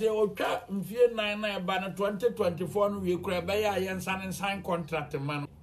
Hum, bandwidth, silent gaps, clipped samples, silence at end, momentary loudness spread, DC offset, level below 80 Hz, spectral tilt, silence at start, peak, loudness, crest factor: none; 14 kHz; none; under 0.1%; 0 s; 7 LU; under 0.1%; -58 dBFS; -5.5 dB/octave; 0 s; -14 dBFS; -30 LUFS; 16 dB